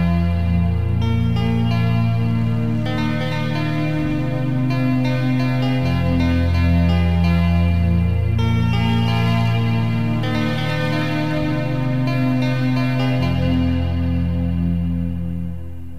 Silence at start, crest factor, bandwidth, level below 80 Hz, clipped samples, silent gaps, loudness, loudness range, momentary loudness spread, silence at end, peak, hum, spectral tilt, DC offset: 0 s; 12 dB; 7.8 kHz; -32 dBFS; under 0.1%; none; -19 LUFS; 3 LU; 4 LU; 0 s; -6 dBFS; none; -8 dB/octave; 3%